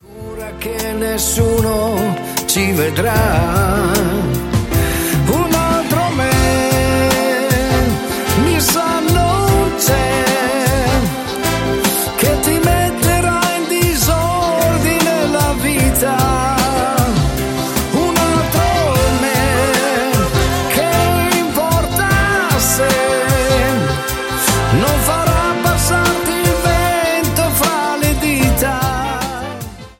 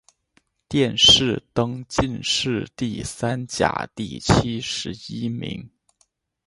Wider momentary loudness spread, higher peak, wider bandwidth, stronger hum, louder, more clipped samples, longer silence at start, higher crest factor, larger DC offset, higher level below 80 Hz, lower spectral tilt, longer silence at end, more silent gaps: second, 4 LU vs 16 LU; about the same, 0 dBFS vs -2 dBFS; first, 17 kHz vs 11.5 kHz; neither; first, -14 LUFS vs -21 LUFS; neither; second, 0.1 s vs 0.7 s; second, 14 dB vs 22 dB; neither; first, -26 dBFS vs -42 dBFS; about the same, -4.5 dB/octave vs -3.5 dB/octave; second, 0.1 s vs 0.8 s; neither